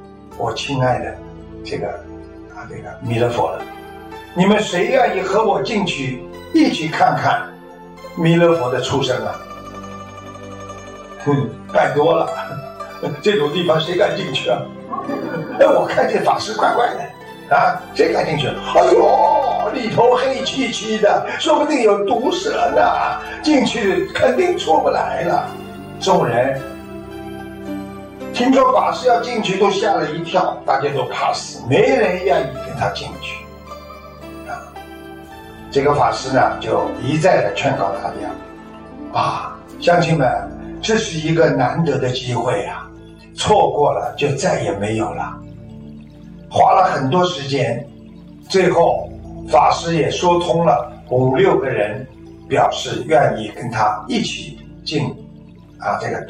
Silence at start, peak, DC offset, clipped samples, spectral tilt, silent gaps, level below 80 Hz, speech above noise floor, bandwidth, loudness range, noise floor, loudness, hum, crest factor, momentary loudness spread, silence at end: 0 s; -2 dBFS; under 0.1%; under 0.1%; -5.5 dB/octave; none; -46 dBFS; 24 dB; 15.5 kHz; 5 LU; -40 dBFS; -17 LUFS; none; 16 dB; 19 LU; 0 s